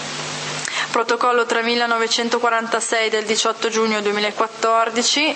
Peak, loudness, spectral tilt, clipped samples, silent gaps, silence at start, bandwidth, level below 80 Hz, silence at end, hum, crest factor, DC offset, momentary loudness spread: -2 dBFS; -19 LUFS; -1.5 dB/octave; under 0.1%; none; 0 s; 8.8 kHz; -72 dBFS; 0 s; none; 16 dB; under 0.1%; 5 LU